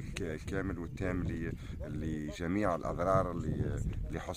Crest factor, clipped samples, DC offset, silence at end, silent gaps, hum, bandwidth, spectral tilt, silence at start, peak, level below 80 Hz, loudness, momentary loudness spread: 18 dB; under 0.1%; under 0.1%; 0 s; none; none; 15.5 kHz; -7 dB/octave; 0 s; -16 dBFS; -44 dBFS; -36 LUFS; 9 LU